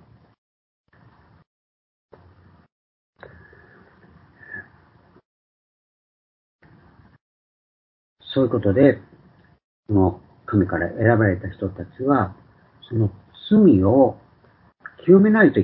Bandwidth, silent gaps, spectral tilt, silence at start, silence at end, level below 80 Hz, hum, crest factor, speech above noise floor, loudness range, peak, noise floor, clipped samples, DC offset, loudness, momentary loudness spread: 4.4 kHz; 5.25-6.59 s, 7.21-8.16 s, 9.64-9.83 s; -12.5 dB/octave; 4.5 s; 0 s; -46 dBFS; none; 20 dB; 39 dB; 5 LU; -2 dBFS; -56 dBFS; under 0.1%; under 0.1%; -19 LUFS; 17 LU